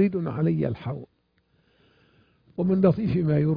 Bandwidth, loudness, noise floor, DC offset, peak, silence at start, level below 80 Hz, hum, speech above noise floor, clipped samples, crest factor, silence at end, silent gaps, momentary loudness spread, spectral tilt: 5.2 kHz; -25 LUFS; -67 dBFS; under 0.1%; -8 dBFS; 0 s; -54 dBFS; none; 44 dB; under 0.1%; 18 dB; 0 s; none; 14 LU; -12 dB/octave